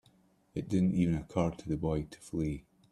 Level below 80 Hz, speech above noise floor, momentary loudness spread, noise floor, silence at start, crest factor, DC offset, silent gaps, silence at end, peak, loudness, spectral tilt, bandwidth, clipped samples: -52 dBFS; 35 dB; 12 LU; -67 dBFS; 0.55 s; 20 dB; under 0.1%; none; 0.3 s; -14 dBFS; -33 LUFS; -8 dB/octave; 11.5 kHz; under 0.1%